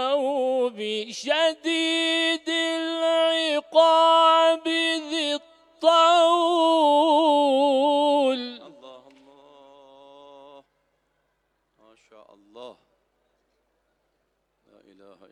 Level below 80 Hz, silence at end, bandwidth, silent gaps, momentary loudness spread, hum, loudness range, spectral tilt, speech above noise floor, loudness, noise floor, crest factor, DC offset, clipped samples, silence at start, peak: -80 dBFS; 2.6 s; 11.5 kHz; none; 9 LU; none; 6 LU; -1.5 dB/octave; 49 dB; -21 LUFS; -73 dBFS; 18 dB; under 0.1%; under 0.1%; 0 s; -6 dBFS